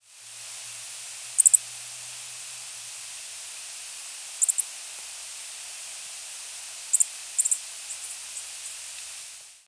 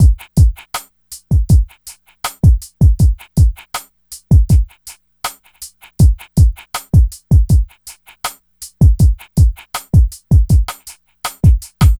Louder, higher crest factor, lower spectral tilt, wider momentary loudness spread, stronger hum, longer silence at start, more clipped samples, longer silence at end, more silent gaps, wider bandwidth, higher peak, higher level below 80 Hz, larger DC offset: second, -27 LUFS vs -14 LUFS; first, 30 dB vs 12 dB; second, 4 dB/octave vs -6.5 dB/octave; second, 14 LU vs 21 LU; neither; about the same, 0.05 s vs 0 s; neither; about the same, 0.05 s vs 0.05 s; neither; second, 11 kHz vs 16 kHz; about the same, -2 dBFS vs -2 dBFS; second, -78 dBFS vs -16 dBFS; neither